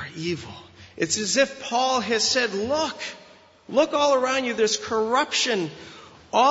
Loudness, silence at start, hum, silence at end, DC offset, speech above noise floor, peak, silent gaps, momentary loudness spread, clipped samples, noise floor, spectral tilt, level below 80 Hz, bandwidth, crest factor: -23 LUFS; 0 s; none; 0 s; under 0.1%; 25 dB; -6 dBFS; none; 13 LU; under 0.1%; -48 dBFS; -2.5 dB/octave; -62 dBFS; 8 kHz; 18 dB